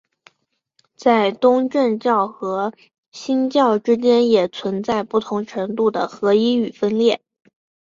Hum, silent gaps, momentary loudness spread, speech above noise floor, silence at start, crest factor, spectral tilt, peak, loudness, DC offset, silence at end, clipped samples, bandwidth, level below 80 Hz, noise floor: none; 2.98-3.12 s; 9 LU; 54 dB; 1 s; 16 dB; -6 dB/octave; -2 dBFS; -19 LUFS; under 0.1%; 0.65 s; under 0.1%; 7.6 kHz; -64 dBFS; -71 dBFS